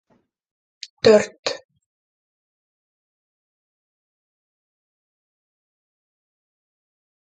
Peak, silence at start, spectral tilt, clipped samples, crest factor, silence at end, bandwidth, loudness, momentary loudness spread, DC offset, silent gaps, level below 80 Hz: -2 dBFS; 1.05 s; -4 dB/octave; under 0.1%; 26 dB; 5.85 s; 9 kHz; -18 LUFS; 24 LU; under 0.1%; 1.39-1.43 s; -64 dBFS